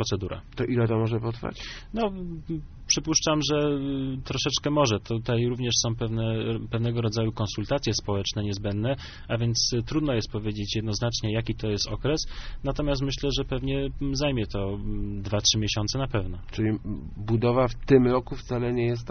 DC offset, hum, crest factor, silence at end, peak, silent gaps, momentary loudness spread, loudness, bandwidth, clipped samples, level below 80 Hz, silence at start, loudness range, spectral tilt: under 0.1%; none; 20 dB; 0 s; -6 dBFS; none; 10 LU; -27 LUFS; 6.6 kHz; under 0.1%; -40 dBFS; 0 s; 3 LU; -5 dB/octave